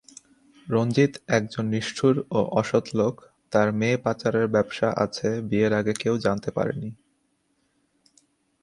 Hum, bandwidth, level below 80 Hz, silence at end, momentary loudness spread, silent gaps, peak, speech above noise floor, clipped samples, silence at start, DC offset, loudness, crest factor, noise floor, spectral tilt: none; 11.5 kHz; -60 dBFS; 1.7 s; 5 LU; none; -6 dBFS; 47 dB; under 0.1%; 0.65 s; under 0.1%; -24 LUFS; 20 dB; -70 dBFS; -6 dB/octave